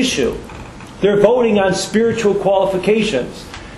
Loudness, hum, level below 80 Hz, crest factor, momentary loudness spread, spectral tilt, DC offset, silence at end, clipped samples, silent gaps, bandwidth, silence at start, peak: -15 LUFS; none; -40 dBFS; 16 dB; 19 LU; -4.5 dB/octave; under 0.1%; 0 s; under 0.1%; none; 12.5 kHz; 0 s; 0 dBFS